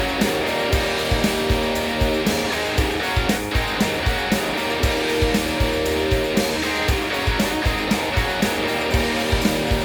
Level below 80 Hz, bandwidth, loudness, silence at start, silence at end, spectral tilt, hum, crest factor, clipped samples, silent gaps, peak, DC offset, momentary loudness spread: -28 dBFS; over 20 kHz; -21 LUFS; 0 s; 0 s; -4.5 dB/octave; none; 16 dB; under 0.1%; none; -4 dBFS; under 0.1%; 1 LU